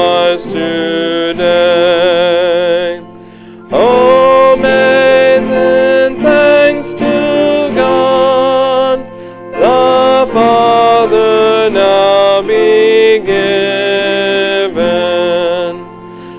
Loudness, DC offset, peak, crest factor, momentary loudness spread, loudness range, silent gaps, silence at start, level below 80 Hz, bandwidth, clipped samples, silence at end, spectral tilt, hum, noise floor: -9 LUFS; under 0.1%; 0 dBFS; 10 dB; 8 LU; 3 LU; none; 0 s; -46 dBFS; 4 kHz; under 0.1%; 0 s; -8.5 dB/octave; none; -32 dBFS